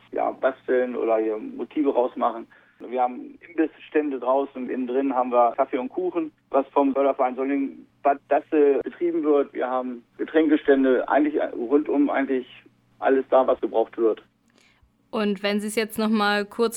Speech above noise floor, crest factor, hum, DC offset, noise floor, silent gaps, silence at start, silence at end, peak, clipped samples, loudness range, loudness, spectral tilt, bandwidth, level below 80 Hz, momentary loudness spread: 38 dB; 18 dB; none; under 0.1%; -61 dBFS; none; 0.1 s; 0 s; -6 dBFS; under 0.1%; 4 LU; -23 LUFS; -5.5 dB/octave; 16.5 kHz; -66 dBFS; 9 LU